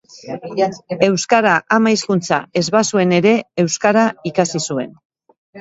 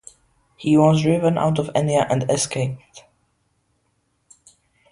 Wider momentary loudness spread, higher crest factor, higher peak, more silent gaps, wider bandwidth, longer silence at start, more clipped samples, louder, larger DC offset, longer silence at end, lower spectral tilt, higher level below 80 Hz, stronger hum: about the same, 9 LU vs 11 LU; about the same, 16 dB vs 20 dB; about the same, 0 dBFS vs -2 dBFS; first, 5.05-5.10 s, 5.38-5.53 s vs none; second, 8 kHz vs 11.5 kHz; second, 0.15 s vs 0.6 s; neither; first, -16 LUFS vs -19 LUFS; neither; second, 0 s vs 1.95 s; second, -4.5 dB/octave vs -6 dB/octave; second, -60 dBFS vs -54 dBFS; neither